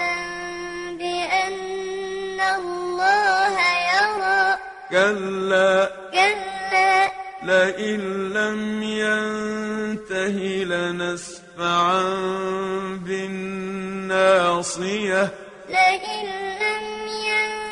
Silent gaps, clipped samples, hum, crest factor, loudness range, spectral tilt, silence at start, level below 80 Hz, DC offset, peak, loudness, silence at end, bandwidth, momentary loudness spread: none; under 0.1%; none; 18 dB; 5 LU; -3.5 dB/octave; 0 s; -58 dBFS; under 0.1%; -4 dBFS; -22 LUFS; 0 s; 11 kHz; 11 LU